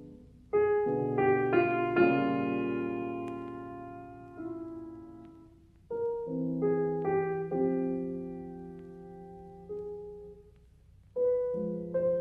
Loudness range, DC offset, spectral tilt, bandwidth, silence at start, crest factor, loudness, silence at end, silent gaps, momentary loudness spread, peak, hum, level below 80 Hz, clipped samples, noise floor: 12 LU; under 0.1%; -9.5 dB/octave; 4.9 kHz; 0 s; 20 dB; -31 LUFS; 0 s; none; 21 LU; -12 dBFS; none; -62 dBFS; under 0.1%; -58 dBFS